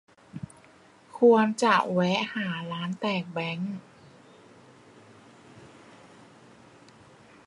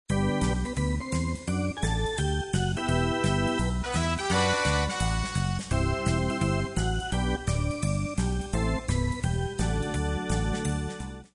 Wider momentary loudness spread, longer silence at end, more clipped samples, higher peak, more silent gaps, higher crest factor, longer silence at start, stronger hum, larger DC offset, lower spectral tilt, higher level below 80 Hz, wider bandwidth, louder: first, 22 LU vs 4 LU; first, 1.8 s vs 0.1 s; neither; first, -8 dBFS vs -12 dBFS; neither; first, 22 dB vs 16 dB; first, 0.35 s vs 0.1 s; neither; neither; about the same, -5.5 dB/octave vs -5 dB/octave; second, -72 dBFS vs -34 dBFS; about the same, 11.5 kHz vs 10.5 kHz; first, -25 LUFS vs -28 LUFS